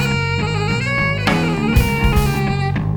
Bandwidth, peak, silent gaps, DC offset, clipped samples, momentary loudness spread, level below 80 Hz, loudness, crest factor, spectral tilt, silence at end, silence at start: over 20 kHz; 0 dBFS; none; under 0.1%; under 0.1%; 3 LU; -24 dBFS; -17 LUFS; 16 dB; -6 dB/octave; 0 s; 0 s